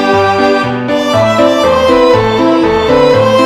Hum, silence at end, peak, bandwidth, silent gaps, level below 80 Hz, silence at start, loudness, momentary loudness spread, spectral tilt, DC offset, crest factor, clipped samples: none; 0 s; 0 dBFS; 13.5 kHz; none; -34 dBFS; 0 s; -9 LUFS; 4 LU; -5.5 dB/octave; under 0.1%; 8 dB; 1%